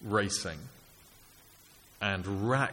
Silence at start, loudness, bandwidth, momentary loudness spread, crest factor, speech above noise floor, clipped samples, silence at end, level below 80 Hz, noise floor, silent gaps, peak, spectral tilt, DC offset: 0 s; -32 LUFS; 17 kHz; 15 LU; 20 dB; 27 dB; under 0.1%; 0 s; -60 dBFS; -58 dBFS; none; -14 dBFS; -4 dB/octave; under 0.1%